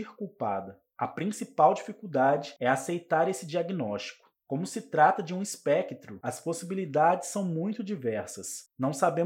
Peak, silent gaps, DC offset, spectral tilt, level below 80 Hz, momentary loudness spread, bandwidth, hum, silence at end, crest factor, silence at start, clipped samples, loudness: -10 dBFS; none; under 0.1%; -5 dB/octave; -80 dBFS; 13 LU; 16.5 kHz; none; 0 s; 20 dB; 0 s; under 0.1%; -29 LUFS